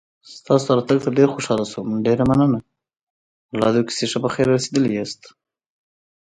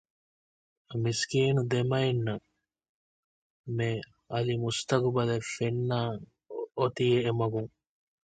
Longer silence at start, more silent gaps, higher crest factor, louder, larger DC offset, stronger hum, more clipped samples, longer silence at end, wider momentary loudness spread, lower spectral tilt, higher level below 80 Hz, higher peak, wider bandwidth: second, 0.3 s vs 0.9 s; second, 3.03-3.49 s vs 2.89-3.64 s; about the same, 18 dB vs 20 dB; first, -19 LUFS vs -30 LUFS; neither; neither; neither; first, 1.05 s vs 0.65 s; second, 9 LU vs 13 LU; about the same, -6 dB/octave vs -6 dB/octave; first, -52 dBFS vs -62 dBFS; first, -2 dBFS vs -10 dBFS; first, 10.5 kHz vs 9.2 kHz